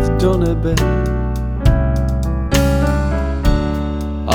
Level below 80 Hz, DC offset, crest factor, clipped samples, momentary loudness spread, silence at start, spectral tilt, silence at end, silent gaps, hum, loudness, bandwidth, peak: -18 dBFS; under 0.1%; 14 dB; under 0.1%; 5 LU; 0 s; -6.5 dB/octave; 0 s; none; none; -17 LUFS; 17.5 kHz; 0 dBFS